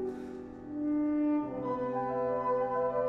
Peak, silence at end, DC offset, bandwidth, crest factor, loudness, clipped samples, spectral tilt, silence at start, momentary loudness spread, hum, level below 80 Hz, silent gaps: -20 dBFS; 0 s; under 0.1%; 4.3 kHz; 12 dB; -32 LUFS; under 0.1%; -9.5 dB/octave; 0 s; 12 LU; none; -62 dBFS; none